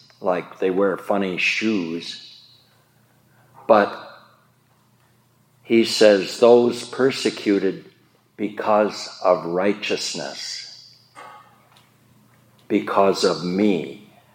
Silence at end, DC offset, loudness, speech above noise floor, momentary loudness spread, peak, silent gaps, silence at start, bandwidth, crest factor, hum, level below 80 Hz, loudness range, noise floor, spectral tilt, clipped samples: 0.35 s; under 0.1%; -20 LUFS; 40 dB; 15 LU; -2 dBFS; none; 0.2 s; 16.5 kHz; 20 dB; none; -74 dBFS; 7 LU; -59 dBFS; -4.5 dB/octave; under 0.1%